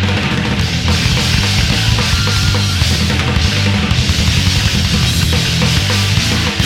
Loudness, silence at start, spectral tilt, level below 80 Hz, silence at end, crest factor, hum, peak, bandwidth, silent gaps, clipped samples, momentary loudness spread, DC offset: -13 LUFS; 0 s; -4 dB/octave; -22 dBFS; 0 s; 12 dB; none; 0 dBFS; 16.5 kHz; none; under 0.1%; 2 LU; under 0.1%